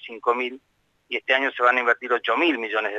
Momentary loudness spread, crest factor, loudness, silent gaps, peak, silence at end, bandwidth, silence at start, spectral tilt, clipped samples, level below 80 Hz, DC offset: 10 LU; 18 dB; -22 LUFS; none; -6 dBFS; 0 s; 8 kHz; 0.05 s; -3 dB/octave; under 0.1%; -76 dBFS; under 0.1%